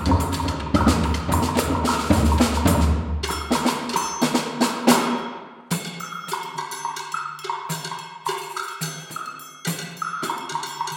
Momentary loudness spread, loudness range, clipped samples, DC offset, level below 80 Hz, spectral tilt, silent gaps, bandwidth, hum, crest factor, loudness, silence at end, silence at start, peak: 11 LU; 9 LU; under 0.1%; under 0.1%; -34 dBFS; -4.5 dB/octave; none; 18.5 kHz; none; 22 dB; -23 LUFS; 0 s; 0 s; 0 dBFS